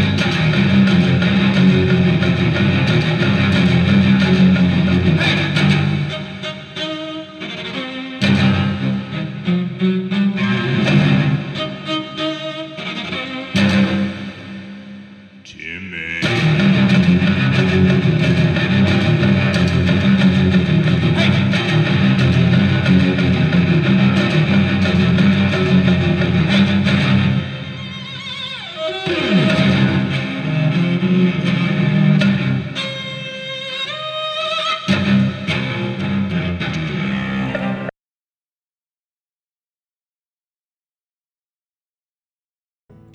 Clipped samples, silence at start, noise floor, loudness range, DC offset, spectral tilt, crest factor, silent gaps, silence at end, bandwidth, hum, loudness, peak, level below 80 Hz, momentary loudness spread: under 0.1%; 0 s; under -90 dBFS; 7 LU; under 0.1%; -7 dB/octave; 14 dB; none; 5.25 s; 8.8 kHz; none; -16 LUFS; -2 dBFS; -44 dBFS; 12 LU